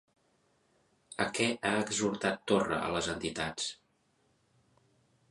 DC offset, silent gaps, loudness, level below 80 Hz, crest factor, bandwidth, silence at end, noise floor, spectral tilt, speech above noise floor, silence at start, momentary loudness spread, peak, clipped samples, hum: under 0.1%; none; -32 LUFS; -62 dBFS; 22 dB; 11.5 kHz; 1.55 s; -73 dBFS; -3.5 dB/octave; 41 dB; 1.1 s; 6 LU; -14 dBFS; under 0.1%; none